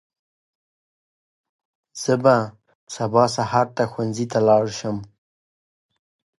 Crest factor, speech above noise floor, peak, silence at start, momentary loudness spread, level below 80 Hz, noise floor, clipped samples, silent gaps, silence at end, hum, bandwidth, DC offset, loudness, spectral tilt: 20 dB; over 70 dB; -2 dBFS; 1.95 s; 14 LU; -60 dBFS; under -90 dBFS; under 0.1%; 2.75-2.87 s; 1.35 s; none; 11.5 kHz; under 0.1%; -20 LUFS; -5.5 dB/octave